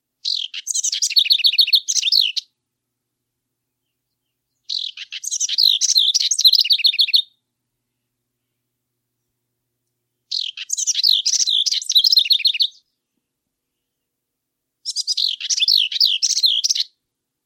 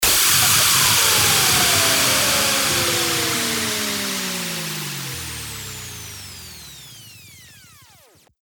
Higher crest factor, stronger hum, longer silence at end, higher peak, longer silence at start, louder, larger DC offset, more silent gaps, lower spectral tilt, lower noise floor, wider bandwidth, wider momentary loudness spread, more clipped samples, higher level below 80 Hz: about the same, 18 dB vs 18 dB; neither; second, 0.6 s vs 0.95 s; about the same, -2 dBFS vs -2 dBFS; first, 0.25 s vs 0 s; about the same, -15 LUFS vs -16 LUFS; neither; neither; second, 9.5 dB/octave vs -1 dB/octave; first, -79 dBFS vs -52 dBFS; second, 16.5 kHz vs over 20 kHz; second, 12 LU vs 20 LU; neither; second, under -90 dBFS vs -46 dBFS